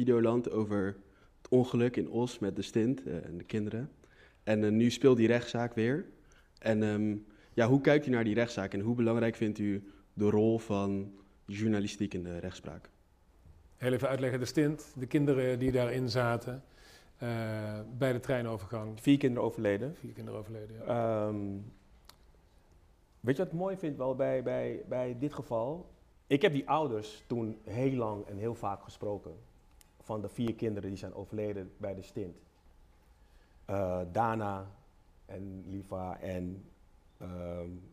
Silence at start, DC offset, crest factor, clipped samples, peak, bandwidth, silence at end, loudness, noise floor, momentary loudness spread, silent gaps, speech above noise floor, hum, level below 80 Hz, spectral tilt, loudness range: 0 s; under 0.1%; 22 dB; under 0.1%; -10 dBFS; 15 kHz; 0.05 s; -33 LUFS; -64 dBFS; 15 LU; none; 32 dB; none; -62 dBFS; -7 dB/octave; 9 LU